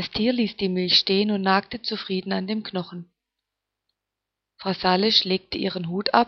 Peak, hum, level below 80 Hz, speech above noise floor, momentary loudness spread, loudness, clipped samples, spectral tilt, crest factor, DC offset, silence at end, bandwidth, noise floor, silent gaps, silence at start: -2 dBFS; none; -58 dBFS; 62 dB; 12 LU; -23 LUFS; under 0.1%; -5.5 dB/octave; 22 dB; under 0.1%; 0 s; 6.4 kHz; -85 dBFS; none; 0 s